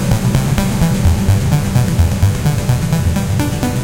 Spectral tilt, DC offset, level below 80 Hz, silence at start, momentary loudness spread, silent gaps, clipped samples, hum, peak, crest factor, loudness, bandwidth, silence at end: -6 dB/octave; under 0.1%; -22 dBFS; 0 s; 3 LU; none; under 0.1%; none; 0 dBFS; 14 dB; -15 LUFS; 17 kHz; 0 s